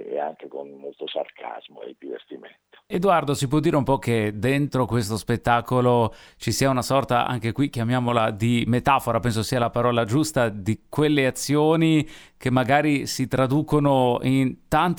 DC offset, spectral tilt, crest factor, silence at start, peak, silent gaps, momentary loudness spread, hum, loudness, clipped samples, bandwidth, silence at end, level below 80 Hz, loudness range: under 0.1%; -6 dB/octave; 18 dB; 0 s; -4 dBFS; none; 16 LU; none; -22 LUFS; under 0.1%; 20 kHz; 0 s; -48 dBFS; 4 LU